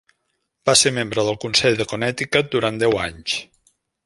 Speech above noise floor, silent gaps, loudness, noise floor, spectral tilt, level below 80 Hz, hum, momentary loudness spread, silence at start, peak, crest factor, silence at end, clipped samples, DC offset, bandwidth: 53 dB; none; -19 LUFS; -73 dBFS; -3 dB/octave; -50 dBFS; none; 10 LU; 0.65 s; -2 dBFS; 20 dB; 0.6 s; under 0.1%; under 0.1%; 11.5 kHz